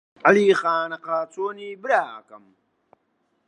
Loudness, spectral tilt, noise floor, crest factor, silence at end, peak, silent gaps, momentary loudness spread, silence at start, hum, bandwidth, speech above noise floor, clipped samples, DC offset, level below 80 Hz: -21 LUFS; -5 dB/octave; -70 dBFS; 22 dB; 1.1 s; 0 dBFS; none; 16 LU; 0.25 s; none; 10 kHz; 48 dB; under 0.1%; under 0.1%; -80 dBFS